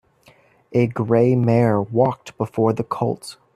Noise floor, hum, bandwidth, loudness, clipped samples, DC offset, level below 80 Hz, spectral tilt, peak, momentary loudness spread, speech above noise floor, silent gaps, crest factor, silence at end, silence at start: -54 dBFS; none; 12 kHz; -20 LUFS; under 0.1%; under 0.1%; -56 dBFS; -8.5 dB/octave; -4 dBFS; 9 LU; 35 dB; none; 16 dB; 0.25 s; 0.7 s